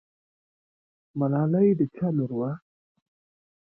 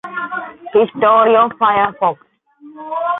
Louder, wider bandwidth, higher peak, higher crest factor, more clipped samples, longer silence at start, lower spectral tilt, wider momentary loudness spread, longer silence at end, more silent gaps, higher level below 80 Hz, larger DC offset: second, -25 LUFS vs -14 LUFS; second, 2.8 kHz vs 4 kHz; second, -12 dBFS vs -2 dBFS; about the same, 16 dB vs 14 dB; neither; first, 1.15 s vs 0.05 s; first, -14 dB/octave vs -8 dB/octave; about the same, 13 LU vs 15 LU; first, 1.05 s vs 0 s; neither; second, -68 dBFS vs -60 dBFS; neither